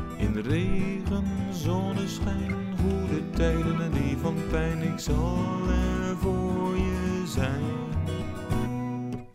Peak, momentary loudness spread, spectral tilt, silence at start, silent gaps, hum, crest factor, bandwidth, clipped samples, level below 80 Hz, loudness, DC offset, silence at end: -12 dBFS; 4 LU; -7 dB/octave; 0 s; none; none; 14 dB; 15.5 kHz; under 0.1%; -34 dBFS; -28 LUFS; under 0.1%; 0 s